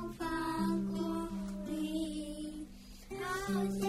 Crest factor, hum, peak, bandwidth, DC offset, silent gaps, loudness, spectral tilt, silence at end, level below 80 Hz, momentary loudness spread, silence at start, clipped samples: 14 dB; none; -22 dBFS; 16 kHz; under 0.1%; none; -38 LUFS; -5.5 dB/octave; 0 s; -54 dBFS; 12 LU; 0 s; under 0.1%